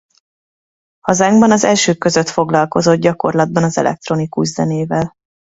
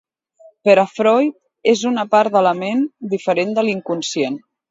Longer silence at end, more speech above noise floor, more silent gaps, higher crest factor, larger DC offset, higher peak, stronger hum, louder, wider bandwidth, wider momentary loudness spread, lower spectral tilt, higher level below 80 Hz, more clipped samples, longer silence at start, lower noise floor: about the same, 0.35 s vs 0.3 s; first, over 77 dB vs 33 dB; neither; about the same, 14 dB vs 18 dB; neither; about the same, 0 dBFS vs 0 dBFS; neither; first, -14 LUFS vs -17 LUFS; about the same, 8 kHz vs 8 kHz; about the same, 9 LU vs 8 LU; about the same, -5 dB/octave vs -4.5 dB/octave; first, -50 dBFS vs -70 dBFS; neither; first, 1.05 s vs 0.65 s; first, under -90 dBFS vs -49 dBFS